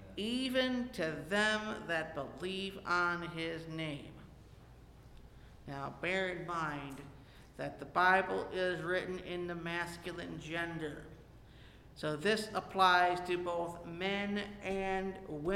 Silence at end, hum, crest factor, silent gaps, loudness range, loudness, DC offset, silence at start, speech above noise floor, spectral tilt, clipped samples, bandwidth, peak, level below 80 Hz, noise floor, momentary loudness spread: 0 s; none; 22 dB; none; 8 LU; -36 LUFS; under 0.1%; 0 s; 21 dB; -4.5 dB/octave; under 0.1%; 16.5 kHz; -14 dBFS; -60 dBFS; -57 dBFS; 14 LU